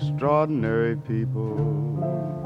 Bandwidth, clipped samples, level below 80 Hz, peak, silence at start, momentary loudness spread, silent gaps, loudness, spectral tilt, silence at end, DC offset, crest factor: 5.4 kHz; under 0.1%; -52 dBFS; -8 dBFS; 0 s; 5 LU; none; -25 LUFS; -10 dB/octave; 0 s; under 0.1%; 16 dB